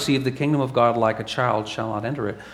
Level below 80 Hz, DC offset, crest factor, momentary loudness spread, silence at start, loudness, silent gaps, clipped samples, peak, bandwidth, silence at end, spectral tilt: -56 dBFS; under 0.1%; 18 dB; 8 LU; 0 s; -23 LUFS; none; under 0.1%; -4 dBFS; 15 kHz; 0 s; -6 dB/octave